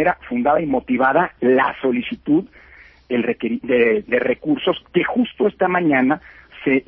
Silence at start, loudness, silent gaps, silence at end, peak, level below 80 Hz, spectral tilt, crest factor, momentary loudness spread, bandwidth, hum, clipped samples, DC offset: 0 s; -19 LUFS; none; 0.05 s; -4 dBFS; -52 dBFS; -9.5 dB/octave; 16 dB; 6 LU; 4.2 kHz; none; under 0.1%; under 0.1%